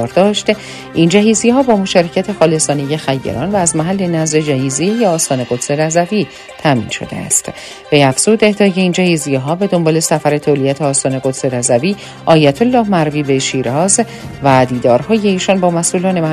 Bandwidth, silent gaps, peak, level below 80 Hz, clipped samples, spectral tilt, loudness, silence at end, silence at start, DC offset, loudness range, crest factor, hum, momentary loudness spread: 14 kHz; none; 0 dBFS; -48 dBFS; 0.1%; -4.5 dB/octave; -13 LUFS; 0 s; 0 s; under 0.1%; 2 LU; 12 dB; none; 7 LU